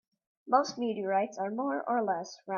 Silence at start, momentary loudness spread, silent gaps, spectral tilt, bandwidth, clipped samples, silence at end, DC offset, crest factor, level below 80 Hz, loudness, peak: 0.45 s; 5 LU; none; -5 dB/octave; 7.2 kHz; under 0.1%; 0 s; under 0.1%; 20 dB; -82 dBFS; -31 LUFS; -12 dBFS